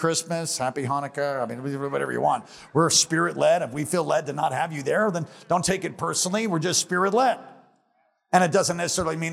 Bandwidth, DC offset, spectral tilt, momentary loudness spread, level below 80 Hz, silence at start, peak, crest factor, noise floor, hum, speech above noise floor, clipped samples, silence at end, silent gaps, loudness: 16 kHz; under 0.1%; -3.5 dB/octave; 8 LU; -60 dBFS; 0 s; -4 dBFS; 20 dB; -68 dBFS; none; 44 dB; under 0.1%; 0 s; none; -24 LUFS